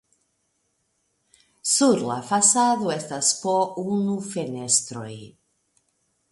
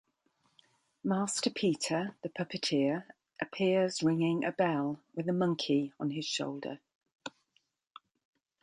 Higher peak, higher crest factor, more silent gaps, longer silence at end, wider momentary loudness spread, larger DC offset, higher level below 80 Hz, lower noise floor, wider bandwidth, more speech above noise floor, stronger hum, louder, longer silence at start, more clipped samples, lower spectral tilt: first, -4 dBFS vs -16 dBFS; about the same, 22 dB vs 18 dB; second, none vs 6.95-7.01 s, 7.15-7.19 s; second, 1.05 s vs 1.35 s; about the same, 14 LU vs 14 LU; neither; first, -70 dBFS vs -78 dBFS; second, -72 dBFS vs -76 dBFS; about the same, 11.5 kHz vs 11.5 kHz; first, 49 dB vs 44 dB; neither; first, -21 LUFS vs -32 LUFS; first, 1.65 s vs 1.05 s; neither; second, -3 dB/octave vs -5 dB/octave